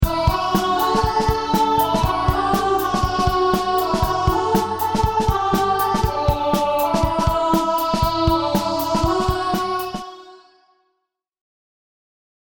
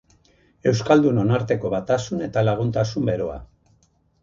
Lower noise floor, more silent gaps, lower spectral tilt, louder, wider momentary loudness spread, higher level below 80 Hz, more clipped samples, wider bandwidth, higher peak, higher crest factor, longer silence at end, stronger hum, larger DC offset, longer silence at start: first, -76 dBFS vs -62 dBFS; neither; second, -5.5 dB/octave vs -7 dB/octave; about the same, -19 LUFS vs -21 LUFS; second, 3 LU vs 8 LU; first, -30 dBFS vs -48 dBFS; neither; first, over 20 kHz vs 7.6 kHz; about the same, -4 dBFS vs -4 dBFS; about the same, 16 dB vs 20 dB; first, 2.2 s vs 0.75 s; neither; neither; second, 0 s vs 0.65 s